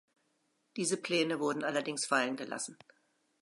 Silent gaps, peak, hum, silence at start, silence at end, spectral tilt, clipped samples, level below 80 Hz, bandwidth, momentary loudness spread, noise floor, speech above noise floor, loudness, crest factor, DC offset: none; -16 dBFS; none; 0.75 s; 0.7 s; -3 dB/octave; under 0.1%; -88 dBFS; 11.5 kHz; 9 LU; -77 dBFS; 43 dB; -33 LUFS; 20 dB; under 0.1%